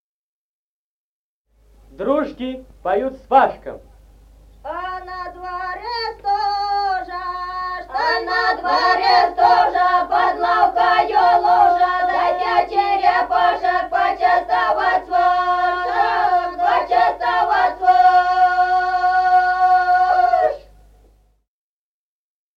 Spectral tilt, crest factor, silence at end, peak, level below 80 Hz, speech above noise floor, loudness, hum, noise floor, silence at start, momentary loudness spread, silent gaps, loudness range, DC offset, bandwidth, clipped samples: -4 dB/octave; 16 dB; 1.95 s; -2 dBFS; -48 dBFS; over 74 dB; -17 LUFS; 50 Hz at -50 dBFS; under -90 dBFS; 2 s; 13 LU; none; 8 LU; under 0.1%; 7 kHz; under 0.1%